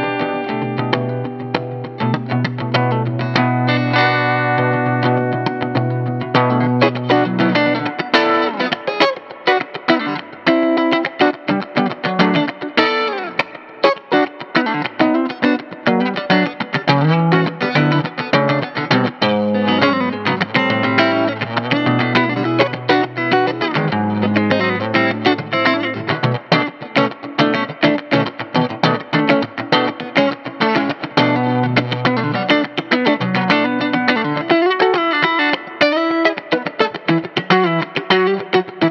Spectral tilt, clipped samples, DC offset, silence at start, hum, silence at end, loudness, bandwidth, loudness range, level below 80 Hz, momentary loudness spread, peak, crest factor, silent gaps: -7 dB/octave; under 0.1%; under 0.1%; 0 s; none; 0 s; -17 LUFS; 7.4 kHz; 2 LU; -62 dBFS; 5 LU; 0 dBFS; 16 dB; none